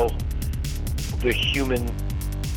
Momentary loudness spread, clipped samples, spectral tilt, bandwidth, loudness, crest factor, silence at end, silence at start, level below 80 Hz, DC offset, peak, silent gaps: 7 LU; under 0.1%; -5 dB/octave; 18.5 kHz; -26 LUFS; 18 dB; 0 s; 0 s; -28 dBFS; under 0.1%; -6 dBFS; none